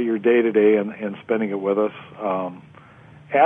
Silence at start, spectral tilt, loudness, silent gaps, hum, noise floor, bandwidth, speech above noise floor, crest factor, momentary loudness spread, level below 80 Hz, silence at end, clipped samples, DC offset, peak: 0 s; -9 dB/octave; -21 LUFS; none; none; -46 dBFS; 3.7 kHz; 26 dB; 16 dB; 12 LU; -66 dBFS; 0 s; under 0.1%; under 0.1%; -4 dBFS